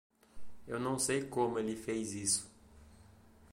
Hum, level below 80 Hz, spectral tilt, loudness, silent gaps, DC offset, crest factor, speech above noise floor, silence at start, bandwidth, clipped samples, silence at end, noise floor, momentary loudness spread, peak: none; -64 dBFS; -3.5 dB/octave; -35 LUFS; none; under 0.1%; 20 dB; 25 dB; 0.25 s; 16.5 kHz; under 0.1%; 0.05 s; -60 dBFS; 7 LU; -18 dBFS